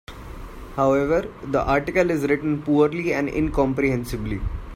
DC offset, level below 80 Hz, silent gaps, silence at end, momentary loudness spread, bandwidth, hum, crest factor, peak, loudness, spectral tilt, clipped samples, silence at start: under 0.1%; -36 dBFS; none; 0 s; 13 LU; 16 kHz; none; 16 dB; -6 dBFS; -22 LUFS; -7 dB/octave; under 0.1%; 0.1 s